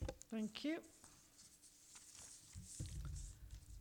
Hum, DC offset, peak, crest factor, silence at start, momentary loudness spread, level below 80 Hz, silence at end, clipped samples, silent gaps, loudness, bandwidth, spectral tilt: none; under 0.1%; -30 dBFS; 20 dB; 0 s; 18 LU; -58 dBFS; 0 s; under 0.1%; none; -50 LUFS; 19 kHz; -4.5 dB/octave